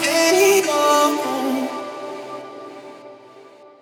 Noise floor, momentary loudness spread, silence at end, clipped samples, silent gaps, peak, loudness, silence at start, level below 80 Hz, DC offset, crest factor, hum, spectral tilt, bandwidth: -45 dBFS; 22 LU; 0.4 s; under 0.1%; none; -4 dBFS; -17 LUFS; 0 s; -80 dBFS; under 0.1%; 16 dB; none; -1.5 dB/octave; 18 kHz